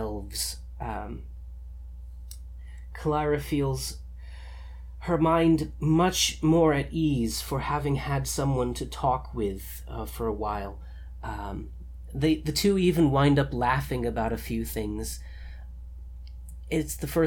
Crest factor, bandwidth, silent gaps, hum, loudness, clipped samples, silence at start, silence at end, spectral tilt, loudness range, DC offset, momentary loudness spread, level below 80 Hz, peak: 18 dB; 19 kHz; none; none; -27 LUFS; under 0.1%; 0 s; 0 s; -5.5 dB/octave; 8 LU; under 0.1%; 22 LU; -40 dBFS; -10 dBFS